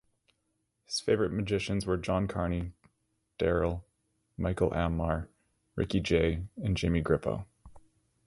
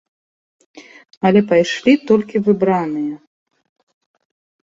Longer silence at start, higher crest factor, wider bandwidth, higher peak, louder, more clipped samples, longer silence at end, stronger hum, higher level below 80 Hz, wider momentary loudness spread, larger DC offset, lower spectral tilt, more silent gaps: first, 0.9 s vs 0.75 s; about the same, 20 dB vs 16 dB; first, 11.5 kHz vs 7.8 kHz; second, -12 dBFS vs -2 dBFS; second, -31 LUFS vs -16 LUFS; neither; second, 0.5 s vs 1.55 s; neither; first, -44 dBFS vs -60 dBFS; about the same, 11 LU vs 10 LU; neither; about the same, -6.5 dB/octave vs -6.5 dB/octave; second, none vs 1.17-1.21 s